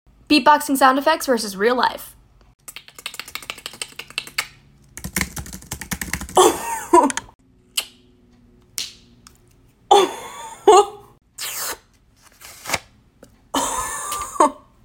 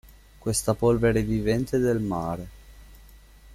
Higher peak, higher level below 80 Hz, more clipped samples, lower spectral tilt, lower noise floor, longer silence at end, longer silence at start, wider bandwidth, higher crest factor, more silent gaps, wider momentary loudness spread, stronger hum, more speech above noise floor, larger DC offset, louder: first, -2 dBFS vs -10 dBFS; second, -48 dBFS vs -42 dBFS; neither; second, -2.5 dB/octave vs -6 dB/octave; first, -54 dBFS vs -50 dBFS; first, 0.3 s vs 0 s; first, 0.3 s vs 0.05 s; about the same, 17 kHz vs 16 kHz; about the same, 20 dB vs 16 dB; first, 2.55-2.59 s, 7.35-7.39 s vs none; first, 20 LU vs 12 LU; neither; first, 37 dB vs 26 dB; neither; first, -19 LUFS vs -25 LUFS